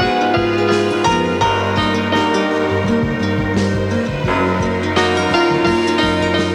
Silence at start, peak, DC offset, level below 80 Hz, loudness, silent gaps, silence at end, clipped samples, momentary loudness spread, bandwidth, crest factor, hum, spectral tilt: 0 s; -2 dBFS; under 0.1%; -38 dBFS; -16 LUFS; none; 0 s; under 0.1%; 3 LU; 12.5 kHz; 14 dB; none; -5.5 dB/octave